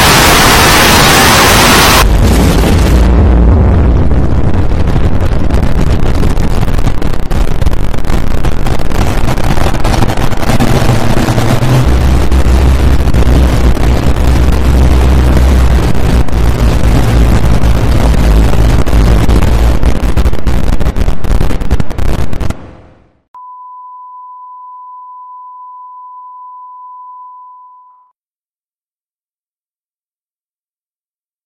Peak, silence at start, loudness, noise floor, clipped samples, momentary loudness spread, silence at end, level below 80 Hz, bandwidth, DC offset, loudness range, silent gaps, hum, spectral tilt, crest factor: 0 dBFS; 0 s; -9 LUFS; under -90 dBFS; 0.4%; 25 LU; 4.15 s; -12 dBFS; 17 kHz; under 0.1%; 22 LU; 23.28-23.34 s; none; -5 dB/octave; 8 dB